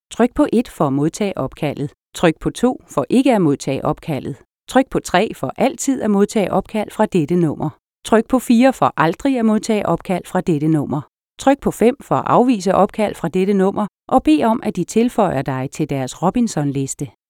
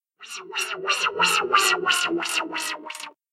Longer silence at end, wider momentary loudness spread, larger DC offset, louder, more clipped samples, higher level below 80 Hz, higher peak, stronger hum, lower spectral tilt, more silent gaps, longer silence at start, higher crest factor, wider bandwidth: about the same, 0.2 s vs 0.25 s; second, 9 LU vs 17 LU; neither; first, -18 LUFS vs -22 LUFS; neither; first, -46 dBFS vs -76 dBFS; first, 0 dBFS vs -4 dBFS; neither; first, -6 dB/octave vs -0.5 dB/octave; neither; about the same, 0.1 s vs 0.2 s; about the same, 16 dB vs 20 dB; about the same, 17 kHz vs 16 kHz